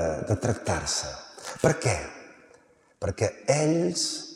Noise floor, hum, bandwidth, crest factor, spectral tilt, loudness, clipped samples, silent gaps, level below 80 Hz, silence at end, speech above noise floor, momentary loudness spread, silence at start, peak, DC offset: -58 dBFS; none; 15 kHz; 22 dB; -4.5 dB/octave; -27 LUFS; under 0.1%; none; -52 dBFS; 0 s; 32 dB; 14 LU; 0 s; -6 dBFS; under 0.1%